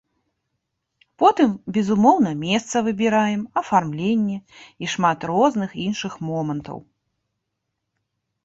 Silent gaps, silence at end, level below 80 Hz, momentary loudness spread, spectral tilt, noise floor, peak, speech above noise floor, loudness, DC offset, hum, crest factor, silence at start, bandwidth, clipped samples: none; 1.65 s; -60 dBFS; 11 LU; -5.5 dB/octave; -79 dBFS; -2 dBFS; 58 dB; -21 LUFS; under 0.1%; none; 20 dB; 1.2 s; 8 kHz; under 0.1%